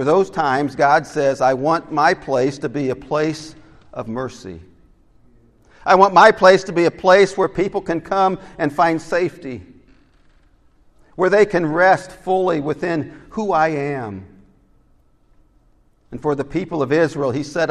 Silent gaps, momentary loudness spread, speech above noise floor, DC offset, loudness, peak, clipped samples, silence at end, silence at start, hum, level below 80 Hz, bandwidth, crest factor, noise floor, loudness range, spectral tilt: none; 17 LU; 38 dB; under 0.1%; -17 LUFS; 0 dBFS; under 0.1%; 0 s; 0 s; none; -50 dBFS; 11.5 kHz; 18 dB; -55 dBFS; 10 LU; -5.5 dB/octave